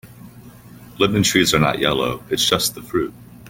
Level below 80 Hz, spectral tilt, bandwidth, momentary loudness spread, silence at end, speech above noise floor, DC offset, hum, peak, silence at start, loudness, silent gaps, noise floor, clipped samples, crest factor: -46 dBFS; -3.5 dB/octave; 17 kHz; 9 LU; 0 s; 23 dB; under 0.1%; 60 Hz at -40 dBFS; -2 dBFS; 0.05 s; -18 LUFS; none; -42 dBFS; under 0.1%; 20 dB